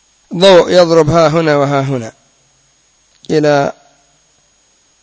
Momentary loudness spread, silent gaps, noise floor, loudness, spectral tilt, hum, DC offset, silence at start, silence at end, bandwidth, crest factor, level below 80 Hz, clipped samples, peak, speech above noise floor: 13 LU; none; -53 dBFS; -10 LUFS; -5.5 dB/octave; none; under 0.1%; 0.3 s; 1.3 s; 8 kHz; 12 dB; -46 dBFS; 0.7%; 0 dBFS; 44 dB